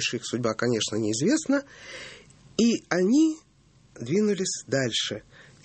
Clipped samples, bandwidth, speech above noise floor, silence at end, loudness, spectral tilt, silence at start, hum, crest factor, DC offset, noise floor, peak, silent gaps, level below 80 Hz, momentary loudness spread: under 0.1%; 8.8 kHz; 33 dB; 0.25 s; -25 LUFS; -4 dB/octave; 0 s; none; 20 dB; under 0.1%; -58 dBFS; -8 dBFS; none; -64 dBFS; 17 LU